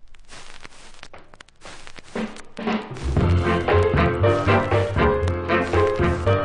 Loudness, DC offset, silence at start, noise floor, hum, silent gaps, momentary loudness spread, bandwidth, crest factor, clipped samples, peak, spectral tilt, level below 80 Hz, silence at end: -21 LUFS; under 0.1%; 0 s; -44 dBFS; none; none; 22 LU; 10.5 kHz; 16 dB; under 0.1%; -6 dBFS; -7 dB/octave; -30 dBFS; 0 s